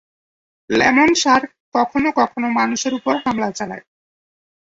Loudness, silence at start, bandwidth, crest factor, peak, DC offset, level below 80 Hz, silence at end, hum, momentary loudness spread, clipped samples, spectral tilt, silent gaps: -17 LUFS; 0.7 s; 8 kHz; 18 dB; -2 dBFS; under 0.1%; -54 dBFS; 0.9 s; none; 11 LU; under 0.1%; -3 dB/octave; 1.60-1.72 s